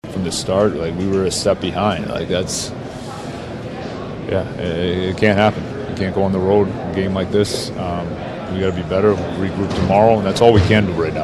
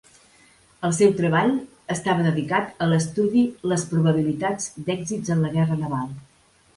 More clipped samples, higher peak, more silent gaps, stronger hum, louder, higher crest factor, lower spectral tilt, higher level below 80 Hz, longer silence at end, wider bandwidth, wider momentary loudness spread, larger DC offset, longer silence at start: neither; first, 0 dBFS vs -4 dBFS; neither; neither; first, -18 LUFS vs -23 LUFS; about the same, 18 dB vs 18 dB; about the same, -5.5 dB/octave vs -6 dB/octave; first, -40 dBFS vs -58 dBFS; second, 0 s vs 0.55 s; first, 13 kHz vs 11.5 kHz; first, 14 LU vs 9 LU; neither; second, 0.05 s vs 0.8 s